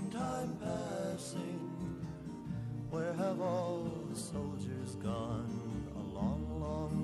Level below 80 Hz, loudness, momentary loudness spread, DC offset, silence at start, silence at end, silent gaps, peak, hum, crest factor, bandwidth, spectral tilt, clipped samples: -54 dBFS; -40 LUFS; 6 LU; under 0.1%; 0 s; 0 s; none; -24 dBFS; none; 14 dB; 13.5 kHz; -6.5 dB/octave; under 0.1%